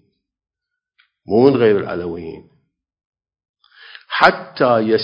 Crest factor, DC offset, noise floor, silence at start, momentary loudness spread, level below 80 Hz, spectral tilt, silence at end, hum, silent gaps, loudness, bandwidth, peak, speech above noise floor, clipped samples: 18 dB; under 0.1%; -76 dBFS; 1.3 s; 15 LU; -54 dBFS; -7 dB/octave; 0 s; none; 3.05-3.13 s, 3.49-3.54 s; -16 LUFS; 8 kHz; 0 dBFS; 61 dB; under 0.1%